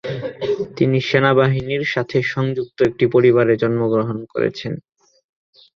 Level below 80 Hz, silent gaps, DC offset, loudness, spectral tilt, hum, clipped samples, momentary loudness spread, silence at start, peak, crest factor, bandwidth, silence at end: -52 dBFS; none; under 0.1%; -18 LUFS; -7.5 dB/octave; none; under 0.1%; 11 LU; 0.05 s; 0 dBFS; 18 dB; 7 kHz; 0.95 s